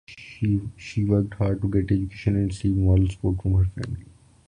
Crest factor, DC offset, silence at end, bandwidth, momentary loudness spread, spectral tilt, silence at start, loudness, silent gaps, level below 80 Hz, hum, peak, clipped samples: 16 dB; under 0.1%; 0.5 s; 9.8 kHz; 11 LU; -8.5 dB/octave; 0.1 s; -24 LUFS; none; -34 dBFS; none; -8 dBFS; under 0.1%